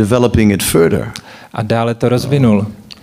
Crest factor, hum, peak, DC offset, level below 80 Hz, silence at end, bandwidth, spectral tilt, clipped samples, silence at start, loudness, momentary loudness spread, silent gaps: 14 dB; none; 0 dBFS; under 0.1%; -36 dBFS; 0.1 s; 16 kHz; -6 dB/octave; under 0.1%; 0 s; -13 LUFS; 14 LU; none